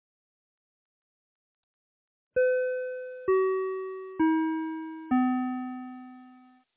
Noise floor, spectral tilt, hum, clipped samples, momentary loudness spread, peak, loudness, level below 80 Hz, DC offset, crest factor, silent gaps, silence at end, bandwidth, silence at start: -56 dBFS; -4.5 dB/octave; none; under 0.1%; 13 LU; -16 dBFS; -29 LUFS; -70 dBFS; under 0.1%; 16 dB; none; 0.4 s; 3.8 kHz; 2.35 s